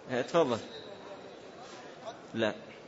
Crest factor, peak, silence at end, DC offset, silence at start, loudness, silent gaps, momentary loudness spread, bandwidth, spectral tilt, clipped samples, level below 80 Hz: 20 dB; -14 dBFS; 0 s; under 0.1%; 0 s; -32 LUFS; none; 19 LU; 8 kHz; -5 dB/octave; under 0.1%; -76 dBFS